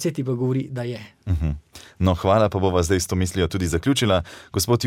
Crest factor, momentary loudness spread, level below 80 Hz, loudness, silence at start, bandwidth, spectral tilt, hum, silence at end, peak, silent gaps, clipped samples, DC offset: 16 dB; 10 LU; -36 dBFS; -22 LUFS; 0 s; 17 kHz; -5.5 dB/octave; none; 0 s; -6 dBFS; none; under 0.1%; under 0.1%